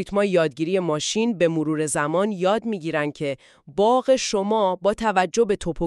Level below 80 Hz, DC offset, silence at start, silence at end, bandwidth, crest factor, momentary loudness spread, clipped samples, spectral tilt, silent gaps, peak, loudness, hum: -48 dBFS; under 0.1%; 0 s; 0 s; 12.5 kHz; 18 dB; 6 LU; under 0.1%; -4.5 dB/octave; none; -4 dBFS; -22 LUFS; none